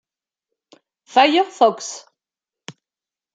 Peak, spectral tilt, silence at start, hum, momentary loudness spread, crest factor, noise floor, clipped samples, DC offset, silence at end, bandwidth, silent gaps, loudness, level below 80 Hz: -2 dBFS; -2.5 dB/octave; 1.15 s; none; 17 LU; 20 dB; under -90 dBFS; under 0.1%; under 0.1%; 1.35 s; 9.2 kHz; none; -17 LUFS; -80 dBFS